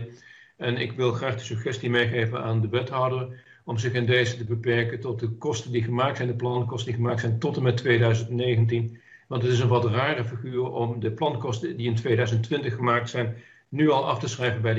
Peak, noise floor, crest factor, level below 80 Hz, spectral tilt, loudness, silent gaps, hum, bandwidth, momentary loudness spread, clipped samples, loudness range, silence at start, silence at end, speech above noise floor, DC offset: -10 dBFS; -50 dBFS; 16 dB; -62 dBFS; -6.5 dB/octave; -26 LUFS; none; none; 7.8 kHz; 8 LU; under 0.1%; 2 LU; 0 s; 0 s; 25 dB; under 0.1%